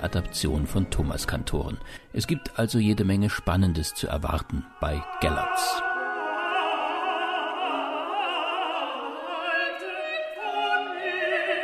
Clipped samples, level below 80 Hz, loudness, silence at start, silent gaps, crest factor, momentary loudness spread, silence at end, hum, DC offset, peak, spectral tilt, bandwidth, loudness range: under 0.1%; -40 dBFS; -27 LUFS; 0 s; none; 18 dB; 7 LU; 0 s; none; under 0.1%; -8 dBFS; -5 dB/octave; 14 kHz; 2 LU